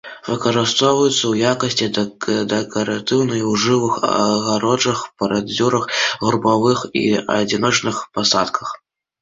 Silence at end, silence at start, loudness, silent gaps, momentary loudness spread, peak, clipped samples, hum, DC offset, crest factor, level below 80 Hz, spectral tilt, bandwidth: 0.45 s; 0.05 s; -18 LUFS; none; 6 LU; -2 dBFS; under 0.1%; none; under 0.1%; 16 dB; -54 dBFS; -4 dB/octave; 7.8 kHz